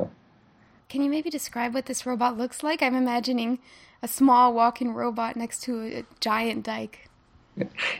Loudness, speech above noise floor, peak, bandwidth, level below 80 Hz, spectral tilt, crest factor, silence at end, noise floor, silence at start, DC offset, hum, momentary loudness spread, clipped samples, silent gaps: -26 LUFS; 33 dB; -8 dBFS; 16.5 kHz; -66 dBFS; -3.5 dB/octave; 18 dB; 0 s; -58 dBFS; 0 s; under 0.1%; none; 15 LU; under 0.1%; none